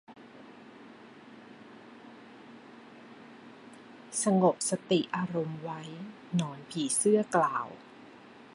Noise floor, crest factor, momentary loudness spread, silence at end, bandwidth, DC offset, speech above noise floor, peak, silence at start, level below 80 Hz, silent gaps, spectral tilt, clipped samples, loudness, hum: -52 dBFS; 22 dB; 26 LU; 0.1 s; 11.5 kHz; under 0.1%; 23 dB; -12 dBFS; 0.1 s; -78 dBFS; none; -4.5 dB/octave; under 0.1%; -30 LUFS; none